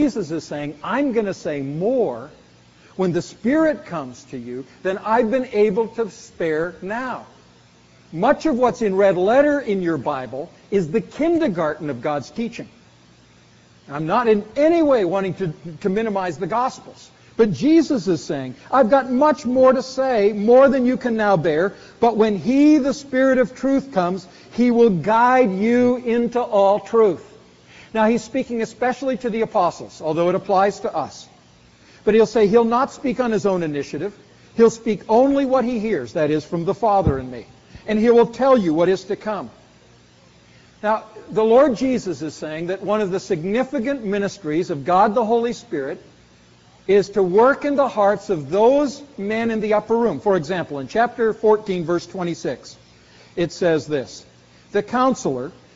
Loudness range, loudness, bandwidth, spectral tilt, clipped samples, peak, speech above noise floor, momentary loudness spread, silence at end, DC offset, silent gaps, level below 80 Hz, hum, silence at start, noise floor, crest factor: 6 LU; -19 LUFS; 8 kHz; -5.5 dB/octave; under 0.1%; -4 dBFS; 32 dB; 13 LU; 0.25 s; under 0.1%; none; -50 dBFS; none; 0 s; -51 dBFS; 16 dB